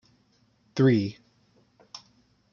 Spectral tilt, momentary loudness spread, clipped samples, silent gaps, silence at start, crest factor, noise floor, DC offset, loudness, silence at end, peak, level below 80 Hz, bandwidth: -8 dB/octave; 24 LU; under 0.1%; none; 0.75 s; 20 dB; -66 dBFS; under 0.1%; -25 LUFS; 0.55 s; -10 dBFS; -72 dBFS; 7 kHz